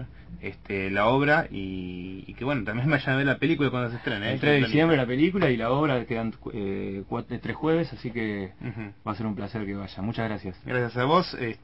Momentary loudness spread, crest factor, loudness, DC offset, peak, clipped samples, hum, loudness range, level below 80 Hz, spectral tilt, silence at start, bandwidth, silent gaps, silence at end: 13 LU; 18 dB; -26 LUFS; 0.2%; -8 dBFS; under 0.1%; none; 7 LU; -50 dBFS; -8.5 dB/octave; 0 s; 8 kHz; none; 0.05 s